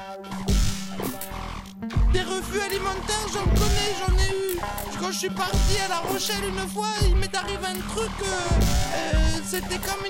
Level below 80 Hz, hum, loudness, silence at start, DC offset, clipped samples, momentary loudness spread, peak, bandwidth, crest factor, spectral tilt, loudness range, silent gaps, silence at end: -28 dBFS; none; -26 LUFS; 0 s; under 0.1%; under 0.1%; 8 LU; -10 dBFS; 16.5 kHz; 14 dB; -4 dB/octave; 2 LU; none; 0 s